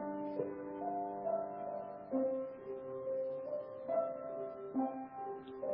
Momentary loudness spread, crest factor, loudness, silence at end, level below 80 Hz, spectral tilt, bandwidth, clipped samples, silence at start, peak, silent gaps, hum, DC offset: 7 LU; 16 dB; -41 LUFS; 0 s; -78 dBFS; -7.5 dB/octave; 4.9 kHz; under 0.1%; 0 s; -24 dBFS; none; none; under 0.1%